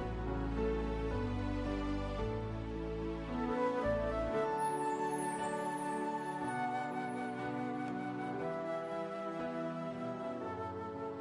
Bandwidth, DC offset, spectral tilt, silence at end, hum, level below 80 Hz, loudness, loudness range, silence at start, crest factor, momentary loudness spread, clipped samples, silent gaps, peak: 11.5 kHz; under 0.1%; -6.5 dB/octave; 0 s; none; -48 dBFS; -38 LUFS; 4 LU; 0 s; 14 dB; 6 LU; under 0.1%; none; -24 dBFS